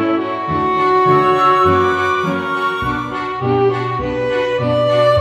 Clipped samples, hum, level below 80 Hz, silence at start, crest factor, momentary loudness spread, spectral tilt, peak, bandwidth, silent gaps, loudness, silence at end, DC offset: under 0.1%; none; -42 dBFS; 0 s; 14 dB; 8 LU; -7 dB/octave; 0 dBFS; 12.5 kHz; none; -15 LUFS; 0 s; under 0.1%